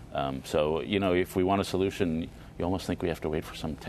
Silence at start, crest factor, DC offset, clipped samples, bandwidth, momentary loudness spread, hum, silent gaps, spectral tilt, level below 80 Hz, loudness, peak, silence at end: 0 s; 18 dB; under 0.1%; under 0.1%; 13.5 kHz; 8 LU; none; none; -6 dB/octave; -48 dBFS; -29 LUFS; -12 dBFS; 0 s